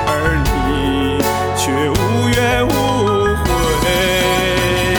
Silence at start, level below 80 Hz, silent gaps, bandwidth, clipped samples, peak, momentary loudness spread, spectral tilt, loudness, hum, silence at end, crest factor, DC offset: 0 s; -26 dBFS; none; 19.5 kHz; under 0.1%; -2 dBFS; 3 LU; -4.5 dB/octave; -15 LUFS; none; 0 s; 12 dB; under 0.1%